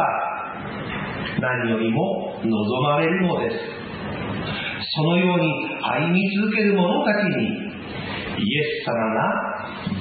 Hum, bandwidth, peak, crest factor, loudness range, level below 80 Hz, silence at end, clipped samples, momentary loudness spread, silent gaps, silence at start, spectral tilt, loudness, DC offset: none; 4.8 kHz; -6 dBFS; 16 dB; 3 LU; -54 dBFS; 0 s; under 0.1%; 10 LU; none; 0 s; -11 dB/octave; -23 LUFS; under 0.1%